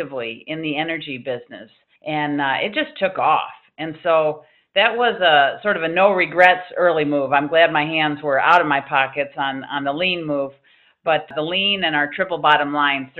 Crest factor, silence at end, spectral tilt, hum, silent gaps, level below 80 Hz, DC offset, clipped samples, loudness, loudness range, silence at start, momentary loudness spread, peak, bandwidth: 20 dB; 0 s; -6 dB/octave; none; none; -64 dBFS; under 0.1%; under 0.1%; -18 LUFS; 6 LU; 0 s; 13 LU; 0 dBFS; 7.8 kHz